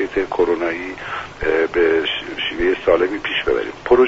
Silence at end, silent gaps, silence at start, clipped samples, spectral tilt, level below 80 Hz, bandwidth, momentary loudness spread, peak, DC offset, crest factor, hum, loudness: 0 s; none; 0 s; under 0.1%; -2 dB/octave; -40 dBFS; 7.8 kHz; 8 LU; 0 dBFS; under 0.1%; 18 dB; none; -19 LUFS